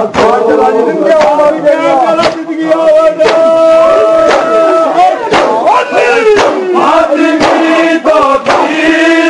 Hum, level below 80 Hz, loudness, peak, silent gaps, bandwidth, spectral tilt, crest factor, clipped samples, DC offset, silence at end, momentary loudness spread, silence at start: none; -42 dBFS; -7 LUFS; 0 dBFS; none; 10.5 kHz; -4 dB/octave; 6 dB; under 0.1%; under 0.1%; 0 s; 3 LU; 0 s